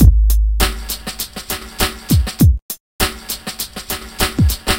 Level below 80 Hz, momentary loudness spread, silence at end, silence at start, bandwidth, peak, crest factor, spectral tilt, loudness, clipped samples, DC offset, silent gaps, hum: -18 dBFS; 11 LU; 0 s; 0 s; 17.5 kHz; 0 dBFS; 16 dB; -4.5 dB/octave; -18 LUFS; 0.1%; 0.7%; 2.62-2.69 s, 2.80-2.99 s; none